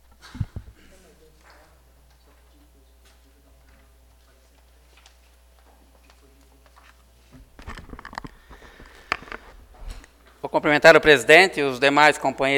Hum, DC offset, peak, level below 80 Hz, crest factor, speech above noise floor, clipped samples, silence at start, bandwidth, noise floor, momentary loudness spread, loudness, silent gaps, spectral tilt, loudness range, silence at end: none; under 0.1%; 0 dBFS; -48 dBFS; 24 dB; 39 dB; under 0.1%; 0.35 s; 17.5 kHz; -55 dBFS; 28 LU; -16 LUFS; none; -3.5 dB/octave; 27 LU; 0 s